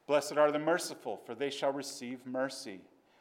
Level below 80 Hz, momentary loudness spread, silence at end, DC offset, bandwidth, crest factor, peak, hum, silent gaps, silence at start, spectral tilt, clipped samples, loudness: under -90 dBFS; 14 LU; 0.4 s; under 0.1%; 17 kHz; 20 dB; -14 dBFS; none; none; 0.1 s; -3.5 dB/octave; under 0.1%; -34 LUFS